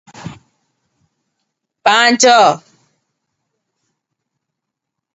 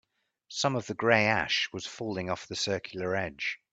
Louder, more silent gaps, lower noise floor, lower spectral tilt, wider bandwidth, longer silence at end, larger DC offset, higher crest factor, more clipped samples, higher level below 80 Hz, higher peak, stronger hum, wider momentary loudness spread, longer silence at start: first, -10 LUFS vs -29 LUFS; neither; first, -79 dBFS vs -57 dBFS; second, -1.5 dB/octave vs -3.5 dB/octave; about the same, 8.2 kHz vs 9 kHz; first, 2.55 s vs 0.15 s; neither; second, 18 dB vs 24 dB; neither; about the same, -62 dBFS vs -66 dBFS; first, 0 dBFS vs -8 dBFS; neither; first, 25 LU vs 11 LU; second, 0.2 s vs 0.5 s